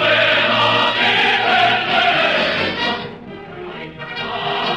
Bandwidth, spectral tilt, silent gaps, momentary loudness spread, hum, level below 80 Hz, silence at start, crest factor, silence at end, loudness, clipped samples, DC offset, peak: 12.5 kHz; -4 dB/octave; none; 18 LU; none; -52 dBFS; 0 s; 14 dB; 0 s; -15 LUFS; under 0.1%; 0.1%; -4 dBFS